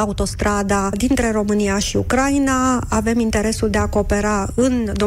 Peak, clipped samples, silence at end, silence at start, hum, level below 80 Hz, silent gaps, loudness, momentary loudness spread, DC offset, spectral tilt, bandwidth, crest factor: -8 dBFS; under 0.1%; 0 s; 0 s; none; -30 dBFS; none; -18 LUFS; 3 LU; under 0.1%; -5 dB/octave; 16 kHz; 10 dB